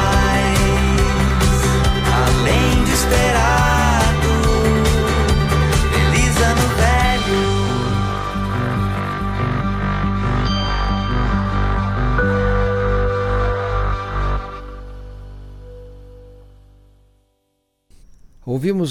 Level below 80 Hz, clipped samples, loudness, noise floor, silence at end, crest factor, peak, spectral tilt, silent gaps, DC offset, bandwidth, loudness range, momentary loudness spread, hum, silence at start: -22 dBFS; under 0.1%; -17 LUFS; -68 dBFS; 0 s; 12 dB; -4 dBFS; -5 dB/octave; none; under 0.1%; 16 kHz; 10 LU; 8 LU; 50 Hz at -40 dBFS; 0 s